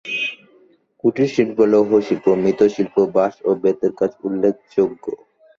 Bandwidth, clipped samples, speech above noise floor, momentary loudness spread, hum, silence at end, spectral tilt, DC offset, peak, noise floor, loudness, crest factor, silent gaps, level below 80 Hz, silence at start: 7.2 kHz; under 0.1%; 37 dB; 7 LU; none; 0.45 s; -6.5 dB/octave; under 0.1%; -4 dBFS; -54 dBFS; -18 LUFS; 16 dB; none; -60 dBFS; 0.05 s